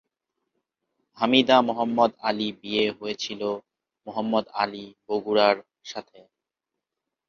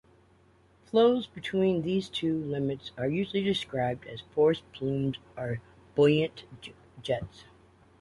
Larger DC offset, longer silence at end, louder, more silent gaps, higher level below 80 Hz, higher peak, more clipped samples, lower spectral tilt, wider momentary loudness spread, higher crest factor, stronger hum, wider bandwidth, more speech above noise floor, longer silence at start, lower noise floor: neither; first, 1.25 s vs 0.6 s; first, -24 LUFS vs -29 LUFS; neither; second, -70 dBFS vs -60 dBFS; first, -4 dBFS vs -12 dBFS; neither; second, -4.5 dB/octave vs -7 dB/octave; first, 18 LU vs 15 LU; about the same, 22 dB vs 18 dB; neither; second, 7.2 kHz vs 11.5 kHz; first, 62 dB vs 33 dB; first, 1.15 s vs 0.95 s; first, -86 dBFS vs -62 dBFS